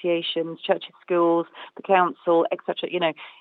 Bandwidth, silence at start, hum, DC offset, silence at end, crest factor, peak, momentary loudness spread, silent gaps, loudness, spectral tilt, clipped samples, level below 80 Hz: 4.5 kHz; 0 s; none; under 0.1%; 0.1 s; 18 dB; -6 dBFS; 7 LU; none; -23 LUFS; -8 dB/octave; under 0.1%; under -90 dBFS